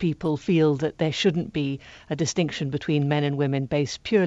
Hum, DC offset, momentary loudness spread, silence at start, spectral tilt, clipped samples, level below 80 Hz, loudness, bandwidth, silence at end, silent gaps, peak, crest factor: none; under 0.1%; 7 LU; 0 s; -6 dB/octave; under 0.1%; -56 dBFS; -25 LUFS; 8 kHz; 0 s; none; -6 dBFS; 18 dB